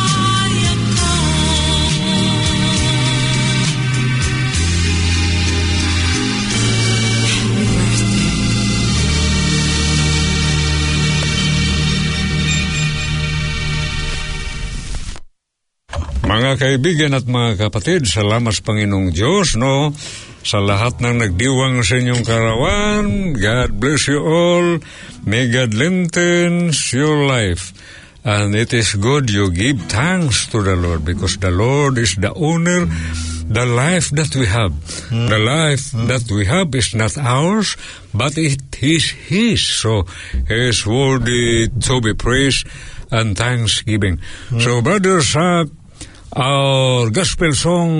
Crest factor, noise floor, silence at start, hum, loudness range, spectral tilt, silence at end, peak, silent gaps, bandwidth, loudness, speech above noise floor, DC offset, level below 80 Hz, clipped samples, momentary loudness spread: 14 dB; -73 dBFS; 0 s; none; 2 LU; -4.5 dB/octave; 0 s; -2 dBFS; none; 11 kHz; -15 LUFS; 58 dB; under 0.1%; -28 dBFS; under 0.1%; 6 LU